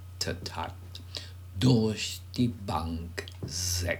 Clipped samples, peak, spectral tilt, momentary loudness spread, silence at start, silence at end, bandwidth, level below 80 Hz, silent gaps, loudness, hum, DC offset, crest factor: under 0.1%; -10 dBFS; -4.5 dB/octave; 15 LU; 0 s; 0 s; 20 kHz; -50 dBFS; none; -31 LUFS; none; under 0.1%; 20 dB